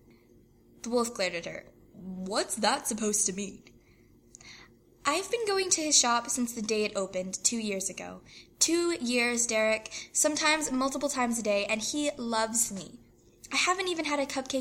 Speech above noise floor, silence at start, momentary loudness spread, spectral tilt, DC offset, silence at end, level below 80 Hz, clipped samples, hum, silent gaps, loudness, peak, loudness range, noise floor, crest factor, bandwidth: 30 dB; 0.85 s; 15 LU; -1.5 dB/octave; under 0.1%; 0 s; -64 dBFS; under 0.1%; none; none; -28 LUFS; -8 dBFS; 4 LU; -60 dBFS; 22 dB; 16.5 kHz